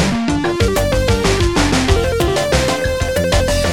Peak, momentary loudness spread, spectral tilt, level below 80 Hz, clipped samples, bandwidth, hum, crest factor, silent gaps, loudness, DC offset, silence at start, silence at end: -2 dBFS; 3 LU; -5 dB/octave; -22 dBFS; under 0.1%; 18 kHz; none; 14 dB; none; -15 LUFS; 1%; 0 s; 0 s